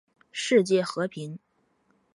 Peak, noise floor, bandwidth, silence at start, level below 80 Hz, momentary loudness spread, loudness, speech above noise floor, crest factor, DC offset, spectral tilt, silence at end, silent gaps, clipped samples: -8 dBFS; -69 dBFS; 11.5 kHz; 0.35 s; -76 dBFS; 18 LU; -25 LUFS; 44 dB; 20 dB; under 0.1%; -4.5 dB/octave; 0.75 s; none; under 0.1%